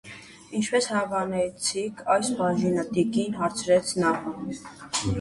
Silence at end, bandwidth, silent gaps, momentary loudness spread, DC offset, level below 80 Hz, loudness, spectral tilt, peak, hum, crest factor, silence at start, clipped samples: 0 s; 11.5 kHz; none; 11 LU; under 0.1%; -54 dBFS; -26 LUFS; -4.5 dB/octave; -8 dBFS; none; 18 dB; 0.05 s; under 0.1%